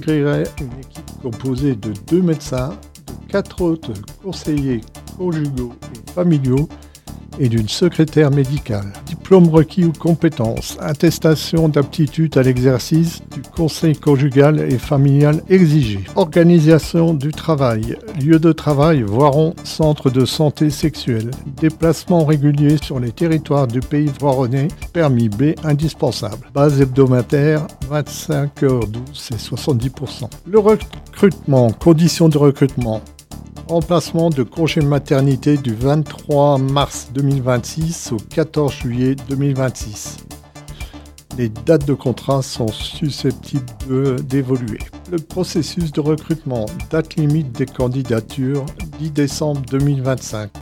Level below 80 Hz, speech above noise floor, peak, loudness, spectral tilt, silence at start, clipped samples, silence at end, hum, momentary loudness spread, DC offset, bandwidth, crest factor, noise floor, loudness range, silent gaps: -38 dBFS; 20 dB; 0 dBFS; -16 LUFS; -7 dB/octave; 0 s; under 0.1%; 0 s; none; 14 LU; under 0.1%; 16 kHz; 16 dB; -35 dBFS; 7 LU; none